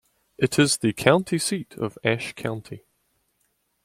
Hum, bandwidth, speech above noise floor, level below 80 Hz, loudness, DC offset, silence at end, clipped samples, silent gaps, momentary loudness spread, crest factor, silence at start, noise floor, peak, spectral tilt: none; 16 kHz; 48 dB; -60 dBFS; -23 LUFS; under 0.1%; 1.05 s; under 0.1%; none; 14 LU; 24 dB; 0.4 s; -71 dBFS; -2 dBFS; -4.5 dB/octave